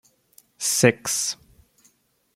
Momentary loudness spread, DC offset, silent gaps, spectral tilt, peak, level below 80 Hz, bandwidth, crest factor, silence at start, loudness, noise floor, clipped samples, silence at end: 9 LU; under 0.1%; none; -3 dB/octave; -2 dBFS; -64 dBFS; 16.5 kHz; 24 dB; 0.6 s; -21 LUFS; -63 dBFS; under 0.1%; 1 s